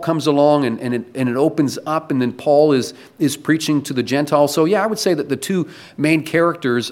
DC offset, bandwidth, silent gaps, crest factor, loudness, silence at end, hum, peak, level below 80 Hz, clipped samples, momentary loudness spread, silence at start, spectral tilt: under 0.1%; 16.5 kHz; none; 16 dB; -18 LUFS; 0 s; none; -2 dBFS; -64 dBFS; under 0.1%; 8 LU; 0 s; -5.5 dB/octave